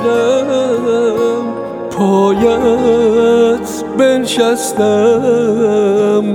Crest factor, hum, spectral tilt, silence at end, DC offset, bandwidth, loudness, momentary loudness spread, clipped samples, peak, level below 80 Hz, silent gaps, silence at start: 12 dB; none; -5 dB/octave; 0 s; under 0.1%; 17 kHz; -12 LUFS; 6 LU; under 0.1%; 0 dBFS; -46 dBFS; none; 0 s